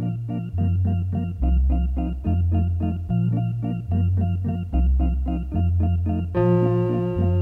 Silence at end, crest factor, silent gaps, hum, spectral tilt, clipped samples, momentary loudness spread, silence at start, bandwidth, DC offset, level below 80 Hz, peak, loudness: 0 s; 14 dB; none; none; -11 dB/octave; under 0.1%; 5 LU; 0 s; 3 kHz; under 0.1%; -28 dBFS; -8 dBFS; -23 LUFS